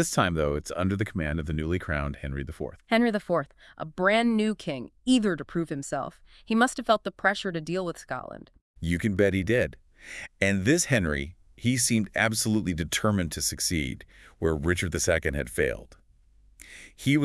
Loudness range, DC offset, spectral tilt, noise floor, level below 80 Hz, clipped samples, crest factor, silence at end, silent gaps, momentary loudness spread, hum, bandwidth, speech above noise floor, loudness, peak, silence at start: 3 LU; under 0.1%; -4.5 dB/octave; -59 dBFS; -46 dBFS; under 0.1%; 20 dB; 0 s; 8.61-8.74 s; 14 LU; none; 12 kHz; 32 dB; -27 LUFS; -8 dBFS; 0 s